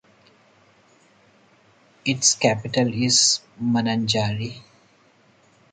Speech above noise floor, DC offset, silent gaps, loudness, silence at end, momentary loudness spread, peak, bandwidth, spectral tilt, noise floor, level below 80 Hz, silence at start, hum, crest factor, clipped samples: 36 dB; under 0.1%; none; -20 LUFS; 1.1 s; 13 LU; -4 dBFS; 9.6 kHz; -3 dB/octave; -58 dBFS; -60 dBFS; 2.05 s; none; 22 dB; under 0.1%